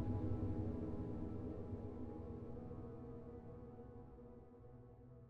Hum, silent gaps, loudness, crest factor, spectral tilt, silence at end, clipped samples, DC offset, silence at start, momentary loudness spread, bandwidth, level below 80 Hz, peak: none; none; -48 LUFS; 16 dB; -11 dB/octave; 0 s; under 0.1%; under 0.1%; 0 s; 17 LU; 4.7 kHz; -58 dBFS; -30 dBFS